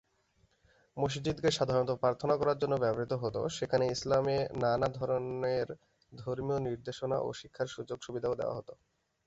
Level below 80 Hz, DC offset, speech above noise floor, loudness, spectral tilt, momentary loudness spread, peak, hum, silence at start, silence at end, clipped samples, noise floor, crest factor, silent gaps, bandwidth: -60 dBFS; under 0.1%; 39 dB; -33 LUFS; -5.5 dB/octave; 10 LU; -16 dBFS; none; 0.95 s; 0.55 s; under 0.1%; -72 dBFS; 18 dB; none; 8.2 kHz